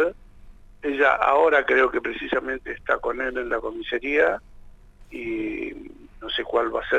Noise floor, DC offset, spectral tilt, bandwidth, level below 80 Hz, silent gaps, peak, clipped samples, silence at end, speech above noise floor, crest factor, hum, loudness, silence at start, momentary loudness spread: -46 dBFS; under 0.1%; -5 dB/octave; 8 kHz; -48 dBFS; none; -6 dBFS; under 0.1%; 0 s; 23 dB; 18 dB; none; -23 LUFS; 0 s; 15 LU